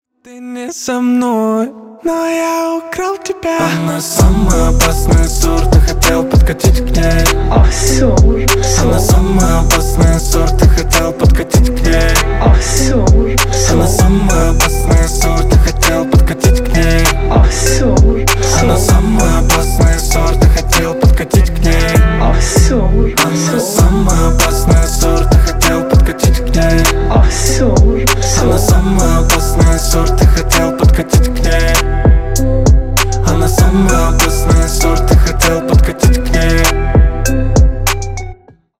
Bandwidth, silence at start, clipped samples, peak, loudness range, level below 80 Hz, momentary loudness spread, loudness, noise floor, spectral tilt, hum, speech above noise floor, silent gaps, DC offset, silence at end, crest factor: 16.5 kHz; 0.3 s; under 0.1%; 0 dBFS; 1 LU; -12 dBFS; 4 LU; -11 LUFS; -34 dBFS; -5 dB/octave; none; 24 dB; none; 0.4%; 0.45 s; 10 dB